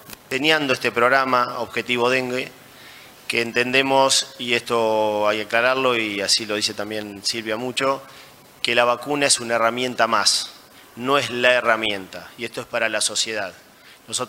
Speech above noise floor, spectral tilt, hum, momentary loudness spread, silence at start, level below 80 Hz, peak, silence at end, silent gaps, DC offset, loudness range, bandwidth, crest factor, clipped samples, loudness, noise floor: 23 dB; -2 dB/octave; none; 11 LU; 0.05 s; -64 dBFS; -2 dBFS; 0 s; none; under 0.1%; 3 LU; 16 kHz; 20 dB; under 0.1%; -20 LUFS; -44 dBFS